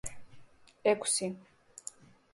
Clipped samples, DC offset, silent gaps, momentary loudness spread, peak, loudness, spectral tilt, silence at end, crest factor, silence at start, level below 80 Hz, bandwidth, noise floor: under 0.1%; under 0.1%; none; 19 LU; -14 dBFS; -31 LUFS; -2.5 dB/octave; 0.9 s; 22 dB; 0.05 s; -64 dBFS; 12 kHz; -56 dBFS